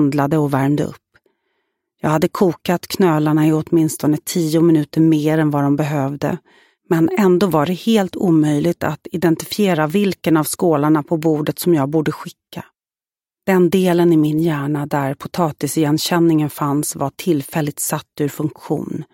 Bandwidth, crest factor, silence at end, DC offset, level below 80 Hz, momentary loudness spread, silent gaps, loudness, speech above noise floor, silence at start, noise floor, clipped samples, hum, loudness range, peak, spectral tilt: 17 kHz; 14 dB; 0.1 s; under 0.1%; -56 dBFS; 9 LU; none; -17 LUFS; over 74 dB; 0 s; under -90 dBFS; under 0.1%; none; 3 LU; -2 dBFS; -6 dB/octave